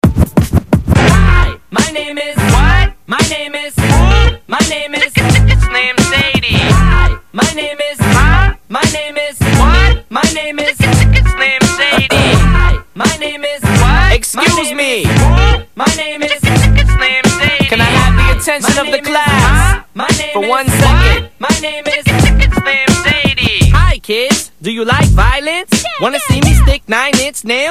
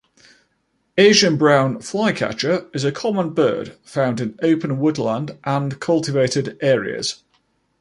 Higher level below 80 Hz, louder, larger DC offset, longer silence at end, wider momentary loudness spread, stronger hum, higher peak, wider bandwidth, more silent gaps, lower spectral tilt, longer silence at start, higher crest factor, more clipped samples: first, -14 dBFS vs -60 dBFS; first, -11 LUFS vs -19 LUFS; first, 0.8% vs under 0.1%; second, 0 s vs 0.65 s; second, 6 LU vs 11 LU; neither; about the same, 0 dBFS vs -2 dBFS; first, 15.5 kHz vs 11.5 kHz; neither; about the same, -4.5 dB/octave vs -5 dB/octave; second, 0.05 s vs 0.95 s; second, 10 dB vs 18 dB; first, 0.7% vs under 0.1%